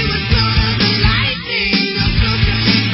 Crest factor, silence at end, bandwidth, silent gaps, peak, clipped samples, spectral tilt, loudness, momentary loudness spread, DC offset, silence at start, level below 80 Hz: 14 dB; 0 s; 5.8 kHz; none; 0 dBFS; under 0.1%; -8 dB/octave; -14 LUFS; 3 LU; under 0.1%; 0 s; -22 dBFS